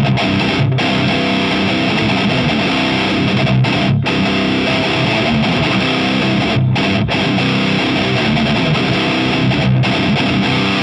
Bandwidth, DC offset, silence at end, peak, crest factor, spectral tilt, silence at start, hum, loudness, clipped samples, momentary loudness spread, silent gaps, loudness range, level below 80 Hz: 10.5 kHz; under 0.1%; 0 s; -2 dBFS; 12 dB; -6 dB/octave; 0 s; none; -14 LUFS; under 0.1%; 1 LU; none; 0 LU; -36 dBFS